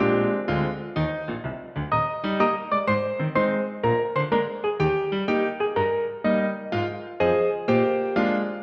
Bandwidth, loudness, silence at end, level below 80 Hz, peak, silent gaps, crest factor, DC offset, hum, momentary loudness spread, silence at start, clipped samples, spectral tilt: 6.2 kHz; -24 LUFS; 0 s; -50 dBFS; -8 dBFS; none; 16 dB; under 0.1%; none; 6 LU; 0 s; under 0.1%; -8.5 dB/octave